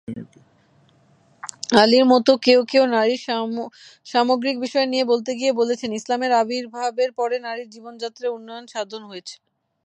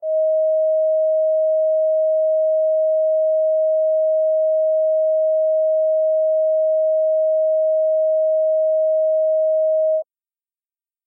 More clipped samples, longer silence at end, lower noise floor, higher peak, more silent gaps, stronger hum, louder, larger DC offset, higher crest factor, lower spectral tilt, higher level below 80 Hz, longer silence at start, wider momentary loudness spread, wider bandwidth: neither; second, 0.5 s vs 1.05 s; second, -57 dBFS vs under -90 dBFS; first, 0 dBFS vs -14 dBFS; neither; neither; about the same, -20 LUFS vs -18 LUFS; neither; first, 22 dB vs 4 dB; second, -3.5 dB/octave vs -8 dB/octave; first, -70 dBFS vs under -90 dBFS; about the same, 0.1 s vs 0 s; first, 20 LU vs 0 LU; first, 10.5 kHz vs 0.8 kHz